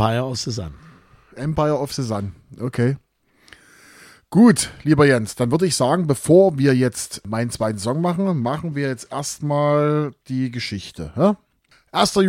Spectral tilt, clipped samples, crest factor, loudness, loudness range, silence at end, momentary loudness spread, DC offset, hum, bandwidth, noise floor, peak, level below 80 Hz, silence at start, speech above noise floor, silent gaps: -5.5 dB/octave; under 0.1%; 18 dB; -20 LUFS; 8 LU; 0 s; 14 LU; under 0.1%; none; 16.5 kHz; -51 dBFS; -2 dBFS; -48 dBFS; 0 s; 32 dB; none